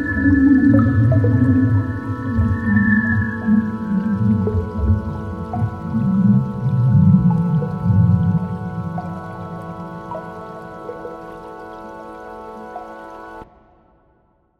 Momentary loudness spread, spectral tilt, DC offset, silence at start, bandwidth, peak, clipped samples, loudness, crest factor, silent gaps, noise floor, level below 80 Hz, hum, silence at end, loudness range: 20 LU; -10.5 dB/octave; under 0.1%; 0 s; 4.7 kHz; -2 dBFS; under 0.1%; -17 LUFS; 16 dB; none; -59 dBFS; -38 dBFS; none; 1.15 s; 17 LU